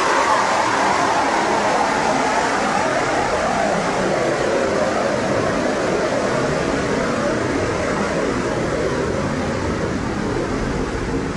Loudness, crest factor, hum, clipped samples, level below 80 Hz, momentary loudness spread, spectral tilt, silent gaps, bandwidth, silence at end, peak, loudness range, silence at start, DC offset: -19 LUFS; 14 dB; none; under 0.1%; -38 dBFS; 5 LU; -4.5 dB/octave; none; 11.5 kHz; 0 s; -4 dBFS; 3 LU; 0 s; under 0.1%